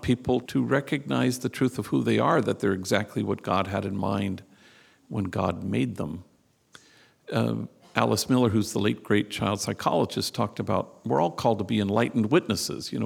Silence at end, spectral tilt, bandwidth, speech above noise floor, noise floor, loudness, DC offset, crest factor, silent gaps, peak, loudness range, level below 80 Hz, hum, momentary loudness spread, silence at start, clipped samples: 0 s; -5.5 dB/octave; 18 kHz; 32 dB; -58 dBFS; -26 LUFS; under 0.1%; 24 dB; none; -2 dBFS; 6 LU; -58 dBFS; none; 7 LU; 0 s; under 0.1%